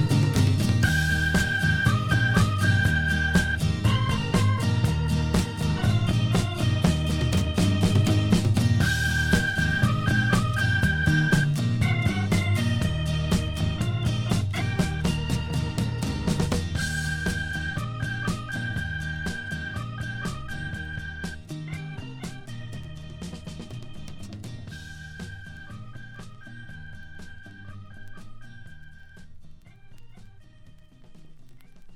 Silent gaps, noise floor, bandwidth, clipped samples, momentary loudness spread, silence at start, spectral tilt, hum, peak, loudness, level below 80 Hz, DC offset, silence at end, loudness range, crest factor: none; -48 dBFS; 16.5 kHz; under 0.1%; 19 LU; 0 s; -5.5 dB/octave; none; -6 dBFS; -25 LUFS; -36 dBFS; under 0.1%; 0 s; 18 LU; 20 dB